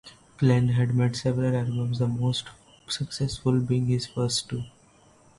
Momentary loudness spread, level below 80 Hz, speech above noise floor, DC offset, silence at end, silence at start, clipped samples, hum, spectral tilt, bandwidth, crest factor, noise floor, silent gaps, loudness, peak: 10 LU; -54 dBFS; 33 dB; under 0.1%; 0.7 s; 0.05 s; under 0.1%; none; -6 dB/octave; 11.5 kHz; 16 dB; -57 dBFS; none; -26 LUFS; -10 dBFS